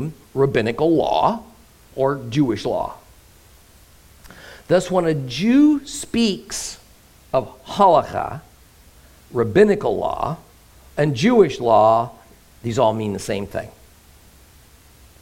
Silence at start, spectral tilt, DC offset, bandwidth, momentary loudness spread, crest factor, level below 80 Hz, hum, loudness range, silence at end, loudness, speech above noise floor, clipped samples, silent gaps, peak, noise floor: 0 s; -6 dB/octave; under 0.1%; 16.5 kHz; 16 LU; 18 dB; -48 dBFS; none; 6 LU; 1.5 s; -19 LUFS; 31 dB; under 0.1%; none; -2 dBFS; -49 dBFS